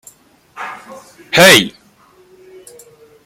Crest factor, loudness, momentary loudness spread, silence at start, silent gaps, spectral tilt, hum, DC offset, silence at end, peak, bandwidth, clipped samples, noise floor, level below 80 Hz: 16 dB; -8 LUFS; 23 LU; 0.6 s; none; -2.5 dB/octave; none; under 0.1%; 1.55 s; 0 dBFS; over 20 kHz; under 0.1%; -49 dBFS; -56 dBFS